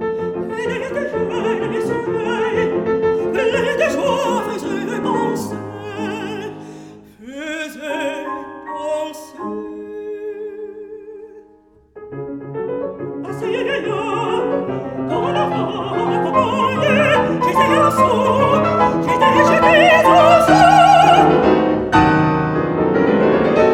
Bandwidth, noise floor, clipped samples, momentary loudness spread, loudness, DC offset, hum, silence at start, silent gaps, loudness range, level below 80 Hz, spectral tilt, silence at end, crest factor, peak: 18 kHz; -50 dBFS; under 0.1%; 19 LU; -16 LUFS; under 0.1%; none; 0 s; none; 17 LU; -44 dBFS; -5.5 dB/octave; 0 s; 16 dB; 0 dBFS